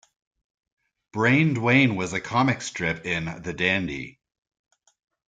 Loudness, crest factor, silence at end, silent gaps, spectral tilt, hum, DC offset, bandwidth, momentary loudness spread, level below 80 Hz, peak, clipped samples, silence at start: -23 LUFS; 20 dB; 1.2 s; none; -5.5 dB/octave; none; under 0.1%; 9.2 kHz; 13 LU; -56 dBFS; -4 dBFS; under 0.1%; 1.15 s